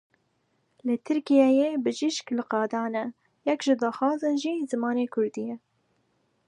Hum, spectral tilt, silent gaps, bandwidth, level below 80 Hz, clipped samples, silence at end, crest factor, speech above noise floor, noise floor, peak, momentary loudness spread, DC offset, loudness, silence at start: none; -4.5 dB/octave; none; 10.5 kHz; -82 dBFS; under 0.1%; 0.9 s; 18 dB; 46 dB; -72 dBFS; -8 dBFS; 12 LU; under 0.1%; -26 LUFS; 0.85 s